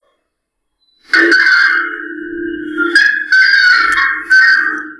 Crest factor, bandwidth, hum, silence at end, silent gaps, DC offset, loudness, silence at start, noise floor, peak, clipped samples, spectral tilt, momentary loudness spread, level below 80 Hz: 12 dB; 11 kHz; none; 0.05 s; none; under 0.1%; -9 LUFS; 1.1 s; -71 dBFS; 0 dBFS; under 0.1%; -1 dB/octave; 15 LU; -52 dBFS